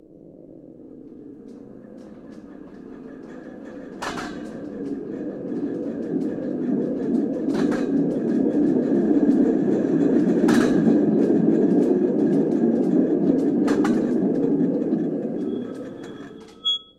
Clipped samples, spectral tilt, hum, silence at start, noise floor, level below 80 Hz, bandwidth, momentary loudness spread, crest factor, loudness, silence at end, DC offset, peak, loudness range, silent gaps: under 0.1%; -7 dB/octave; none; 0.25 s; -45 dBFS; -58 dBFS; 11 kHz; 23 LU; 16 dB; -21 LUFS; 0.15 s; under 0.1%; -6 dBFS; 17 LU; none